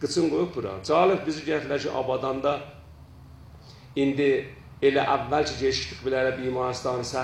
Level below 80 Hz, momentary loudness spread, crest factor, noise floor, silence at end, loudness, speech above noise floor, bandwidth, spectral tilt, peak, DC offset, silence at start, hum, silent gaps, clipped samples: -52 dBFS; 7 LU; 18 dB; -47 dBFS; 0 s; -26 LUFS; 22 dB; 11 kHz; -5 dB/octave; -8 dBFS; under 0.1%; 0 s; none; none; under 0.1%